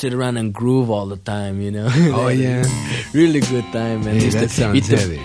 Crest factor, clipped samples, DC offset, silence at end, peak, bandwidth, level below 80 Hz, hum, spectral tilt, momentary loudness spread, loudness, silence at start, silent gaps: 16 dB; under 0.1%; under 0.1%; 0 s; -2 dBFS; 11 kHz; -42 dBFS; none; -6 dB/octave; 8 LU; -18 LUFS; 0 s; none